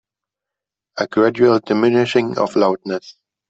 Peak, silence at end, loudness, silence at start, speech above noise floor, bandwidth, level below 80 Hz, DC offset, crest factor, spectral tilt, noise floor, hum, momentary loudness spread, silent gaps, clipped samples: -2 dBFS; 0.4 s; -17 LUFS; 0.95 s; 70 dB; 8 kHz; -62 dBFS; under 0.1%; 16 dB; -6.5 dB/octave; -86 dBFS; none; 12 LU; none; under 0.1%